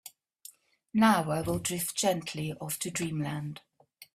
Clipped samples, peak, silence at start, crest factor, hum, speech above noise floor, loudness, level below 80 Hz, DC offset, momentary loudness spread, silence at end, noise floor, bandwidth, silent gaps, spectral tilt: under 0.1%; -10 dBFS; 0.05 s; 22 dB; none; 25 dB; -30 LUFS; -60 dBFS; under 0.1%; 26 LU; 0.1 s; -55 dBFS; 16 kHz; none; -4.5 dB/octave